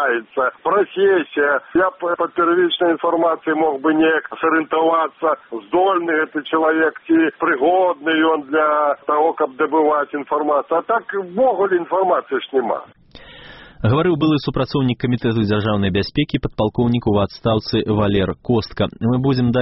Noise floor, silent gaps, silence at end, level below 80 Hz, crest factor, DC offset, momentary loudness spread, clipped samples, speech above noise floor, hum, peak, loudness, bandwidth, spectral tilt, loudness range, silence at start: -40 dBFS; none; 0 s; -44 dBFS; 12 dB; under 0.1%; 5 LU; under 0.1%; 23 dB; none; -4 dBFS; -18 LUFS; 5.8 kHz; -5 dB/octave; 3 LU; 0 s